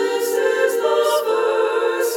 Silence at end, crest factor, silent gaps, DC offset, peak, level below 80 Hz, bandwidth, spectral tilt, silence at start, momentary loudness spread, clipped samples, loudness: 0 s; 12 dB; none; under 0.1%; -6 dBFS; -76 dBFS; 18 kHz; -0.5 dB/octave; 0 s; 2 LU; under 0.1%; -18 LUFS